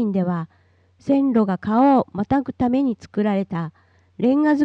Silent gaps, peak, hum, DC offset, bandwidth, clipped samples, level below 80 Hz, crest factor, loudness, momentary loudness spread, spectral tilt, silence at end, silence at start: none; -8 dBFS; none; under 0.1%; 6.4 kHz; under 0.1%; -54 dBFS; 12 dB; -20 LUFS; 12 LU; -9 dB/octave; 0 s; 0 s